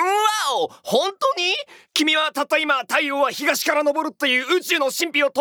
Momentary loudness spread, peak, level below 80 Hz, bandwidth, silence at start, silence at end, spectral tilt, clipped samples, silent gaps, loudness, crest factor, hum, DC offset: 4 LU; -4 dBFS; -82 dBFS; over 20 kHz; 0 s; 0 s; -1.5 dB/octave; under 0.1%; none; -20 LUFS; 16 dB; none; under 0.1%